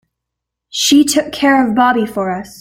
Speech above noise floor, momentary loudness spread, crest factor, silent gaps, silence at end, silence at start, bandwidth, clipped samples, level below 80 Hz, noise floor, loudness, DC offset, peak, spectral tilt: 66 dB; 10 LU; 14 dB; none; 0.1 s; 0.75 s; 16.5 kHz; under 0.1%; -52 dBFS; -79 dBFS; -13 LUFS; under 0.1%; -2 dBFS; -3 dB/octave